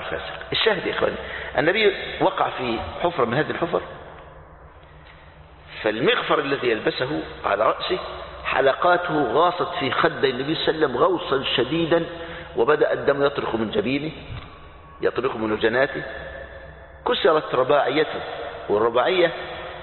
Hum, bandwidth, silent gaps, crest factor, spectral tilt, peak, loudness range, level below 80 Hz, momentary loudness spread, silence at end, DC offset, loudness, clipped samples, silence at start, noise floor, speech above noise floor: none; 4.4 kHz; none; 20 dB; -9.5 dB/octave; -4 dBFS; 5 LU; -48 dBFS; 13 LU; 0 s; under 0.1%; -22 LUFS; under 0.1%; 0 s; -46 dBFS; 24 dB